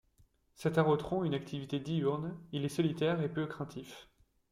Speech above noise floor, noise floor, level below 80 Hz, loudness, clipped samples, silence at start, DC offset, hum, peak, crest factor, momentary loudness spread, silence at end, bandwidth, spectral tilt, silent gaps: 35 dB; -69 dBFS; -66 dBFS; -34 LUFS; under 0.1%; 0.6 s; under 0.1%; none; -16 dBFS; 20 dB; 13 LU; 0.5 s; 14 kHz; -7 dB/octave; none